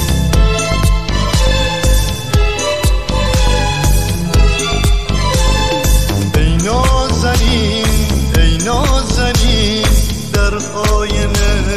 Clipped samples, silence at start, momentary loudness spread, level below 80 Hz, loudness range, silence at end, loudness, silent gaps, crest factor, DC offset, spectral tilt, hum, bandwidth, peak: under 0.1%; 0 s; 3 LU; -14 dBFS; 1 LU; 0 s; -14 LUFS; none; 12 dB; 3%; -4.5 dB/octave; none; 15 kHz; 0 dBFS